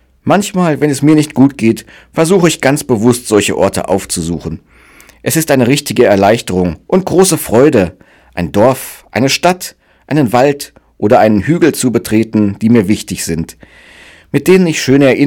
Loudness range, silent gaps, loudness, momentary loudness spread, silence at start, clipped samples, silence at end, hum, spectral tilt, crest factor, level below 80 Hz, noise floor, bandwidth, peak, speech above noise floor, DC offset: 2 LU; none; -11 LUFS; 11 LU; 0.25 s; 1%; 0 s; none; -5.5 dB/octave; 12 dB; -42 dBFS; -41 dBFS; 19 kHz; 0 dBFS; 31 dB; under 0.1%